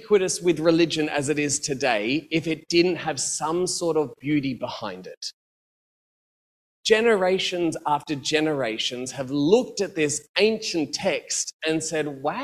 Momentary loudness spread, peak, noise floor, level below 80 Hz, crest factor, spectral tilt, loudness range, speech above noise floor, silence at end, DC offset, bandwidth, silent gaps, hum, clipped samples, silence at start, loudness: 8 LU; -4 dBFS; under -90 dBFS; -62 dBFS; 20 dB; -3.5 dB/octave; 5 LU; over 66 dB; 0 s; under 0.1%; 14.5 kHz; 5.17-5.21 s, 5.33-6.83 s, 10.29-10.34 s, 11.54-11.59 s; none; under 0.1%; 0 s; -24 LUFS